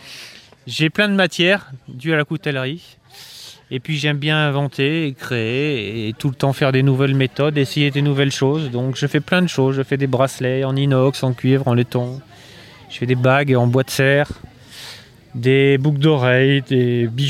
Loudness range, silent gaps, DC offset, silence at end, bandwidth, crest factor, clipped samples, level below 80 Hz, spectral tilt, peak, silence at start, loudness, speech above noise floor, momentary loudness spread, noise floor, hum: 4 LU; none; under 0.1%; 0 s; 15 kHz; 16 dB; under 0.1%; -54 dBFS; -6 dB/octave; -2 dBFS; 0.05 s; -18 LUFS; 25 dB; 19 LU; -42 dBFS; none